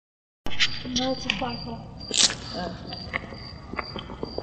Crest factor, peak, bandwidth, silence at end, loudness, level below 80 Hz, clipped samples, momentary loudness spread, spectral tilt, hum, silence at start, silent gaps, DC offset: 24 dB; -4 dBFS; 9.6 kHz; 0 s; -27 LUFS; -46 dBFS; under 0.1%; 17 LU; -2 dB/octave; none; 0.45 s; none; under 0.1%